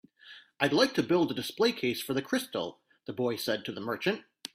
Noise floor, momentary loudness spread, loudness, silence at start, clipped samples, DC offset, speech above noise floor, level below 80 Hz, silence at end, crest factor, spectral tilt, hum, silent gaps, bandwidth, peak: -54 dBFS; 16 LU; -30 LUFS; 0.25 s; under 0.1%; under 0.1%; 24 dB; -70 dBFS; 0.1 s; 22 dB; -4.5 dB/octave; none; none; 16 kHz; -10 dBFS